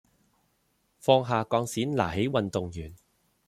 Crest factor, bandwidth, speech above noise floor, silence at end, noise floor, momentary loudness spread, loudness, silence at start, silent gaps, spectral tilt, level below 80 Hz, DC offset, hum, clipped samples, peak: 22 dB; 15 kHz; 45 dB; 0.55 s; -72 dBFS; 14 LU; -27 LUFS; 1.05 s; none; -5.5 dB/octave; -58 dBFS; under 0.1%; none; under 0.1%; -6 dBFS